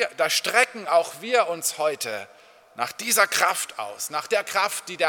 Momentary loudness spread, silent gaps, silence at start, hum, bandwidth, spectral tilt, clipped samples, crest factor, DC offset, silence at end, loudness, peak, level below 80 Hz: 11 LU; none; 0 s; none; 19 kHz; 0 dB/octave; under 0.1%; 22 dB; under 0.1%; 0 s; -23 LUFS; -2 dBFS; -78 dBFS